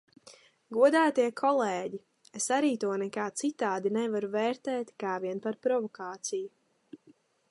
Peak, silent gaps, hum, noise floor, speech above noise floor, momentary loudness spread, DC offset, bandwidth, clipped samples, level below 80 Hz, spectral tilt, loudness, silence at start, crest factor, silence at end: -12 dBFS; none; none; -63 dBFS; 34 dB; 13 LU; under 0.1%; 11.5 kHz; under 0.1%; -84 dBFS; -4 dB/octave; -30 LUFS; 0.25 s; 18 dB; 0.55 s